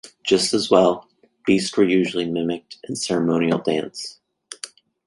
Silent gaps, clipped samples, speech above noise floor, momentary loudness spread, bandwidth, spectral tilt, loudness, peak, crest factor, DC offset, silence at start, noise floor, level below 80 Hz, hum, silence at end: none; under 0.1%; 21 dB; 18 LU; 11.5 kHz; -4.5 dB/octave; -20 LUFS; -2 dBFS; 18 dB; under 0.1%; 0.05 s; -41 dBFS; -60 dBFS; none; 0.4 s